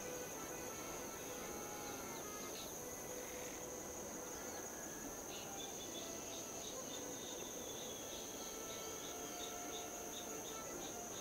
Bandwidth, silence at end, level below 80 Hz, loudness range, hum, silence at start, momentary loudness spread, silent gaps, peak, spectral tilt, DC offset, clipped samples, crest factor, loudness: 16 kHz; 0 s; -70 dBFS; 1 LU; none; 0 s; 1 LU; none; -34 dBFS; -2 dB/octave; under 0.1%; under 0.1%; 14 dB; -46 LUFS